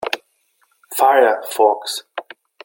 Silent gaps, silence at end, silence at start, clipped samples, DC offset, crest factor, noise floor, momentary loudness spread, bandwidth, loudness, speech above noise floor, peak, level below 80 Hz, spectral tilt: none; 0.4 s; 0 s; under 0.1%; under 0.1%; 18 dB; -63 dBFS; 16 LU; 17 kHz; -17 LUFS; 48 dB; -2 dBFS; -70 dBFS; -0.5 dB/octave